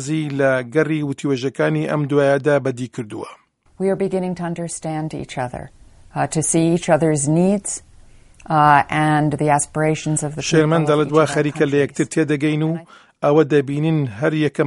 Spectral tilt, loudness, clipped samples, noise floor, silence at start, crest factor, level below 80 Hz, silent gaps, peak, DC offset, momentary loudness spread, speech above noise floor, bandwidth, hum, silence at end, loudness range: -5.5 dB/octave; -18 LUFS; under 0.1%; -45 dBFS; 0 s; 18 dB; -52 dBFS; none; 0 dBFS; under 0.1%; 11 LU; 27 dB; 11.5 kHz; none; 0 s; 6 LU